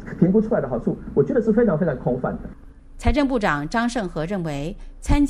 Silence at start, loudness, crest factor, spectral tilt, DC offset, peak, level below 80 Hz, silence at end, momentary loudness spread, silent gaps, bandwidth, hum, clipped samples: 0 s; -22 LUFS; 16 dB; -7 dB/octave; under 0.1%; -4 dBFS; -32 dBFS; 0 s; 11 LU; none; 12.5 kHz; none; under 0.1%